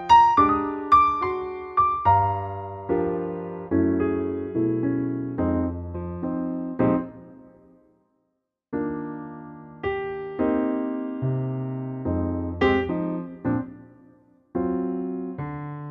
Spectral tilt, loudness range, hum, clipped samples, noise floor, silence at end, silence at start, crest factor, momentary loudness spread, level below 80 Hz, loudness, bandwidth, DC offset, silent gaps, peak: -8 dB/octave; 8 LU; none; under 0.1%; -77 dBFS; 0 s; 0 s; 20 dB; 14 LU; -48 dBFS; -25 LUFS; 7.2 kHz; under 0.1%; none; -6 dBFS